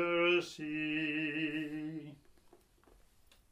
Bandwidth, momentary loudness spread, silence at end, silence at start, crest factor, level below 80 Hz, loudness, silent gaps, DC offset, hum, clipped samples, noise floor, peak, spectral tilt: 12 kHz; 14 LU; 1.35 s; 0 s; 18 dB; -72 dBFS; -35 LUFS; none; under 0.1%; none; under 0.1%; -65 dBFS; -20 dBFS; -5 dB/octave